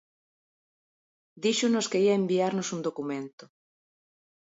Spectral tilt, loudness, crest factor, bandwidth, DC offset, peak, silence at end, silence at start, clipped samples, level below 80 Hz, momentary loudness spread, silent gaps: -4.5 dB/octave; -27 LUFS; 16 dB; 8 kHz; under 0.1%; -14 dBFS; 0.95 s; 1.35 s; under 0.1%; -80 dBFS; 11 LU; 3.33-3.38 s